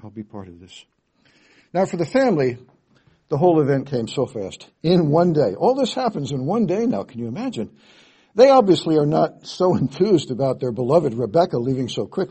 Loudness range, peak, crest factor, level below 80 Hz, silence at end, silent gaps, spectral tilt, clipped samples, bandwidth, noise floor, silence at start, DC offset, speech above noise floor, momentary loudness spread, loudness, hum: 4 LU; -2 dBFS; 18 dB; -58 dBFS; 0.05 s; none; -7 dB/octave; under 0.1%; 8.6 kHz; -59 dBFS; 0.05 s; under 0.1%; 39 dB; 13 LU; -20 LUFS; none